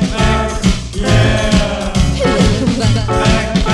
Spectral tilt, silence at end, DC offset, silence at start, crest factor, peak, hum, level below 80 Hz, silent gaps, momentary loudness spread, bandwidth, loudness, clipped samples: -5.5 dB/octave; 0 s; under 0.1%; 0 s; 12 dB; 0 dBFS; none; -20 dBFS; none; 4 LU; 12.5 kHz; -14 LUFS; under 0.1%